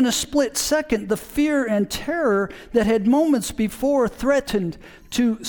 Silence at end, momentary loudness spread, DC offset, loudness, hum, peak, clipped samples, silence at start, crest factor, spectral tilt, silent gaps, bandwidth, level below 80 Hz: 0 s; 7 LU; under 0.1%; -21 LUFS; none; -4 dBFS; under 0.1%; 0 s; 16 dB; -4 dB/octave; none; 19 kHz; -44 dBFS